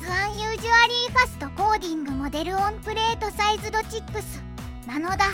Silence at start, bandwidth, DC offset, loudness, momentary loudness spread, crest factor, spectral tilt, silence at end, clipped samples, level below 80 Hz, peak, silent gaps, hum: 0 s; 17 kHz; under 0.1%; -24 LUFS; 15 LU; 20 dB; -3.5 dB/octave; 0 s; under 0.1%; -40 dBFS; -6 dBFS; none; none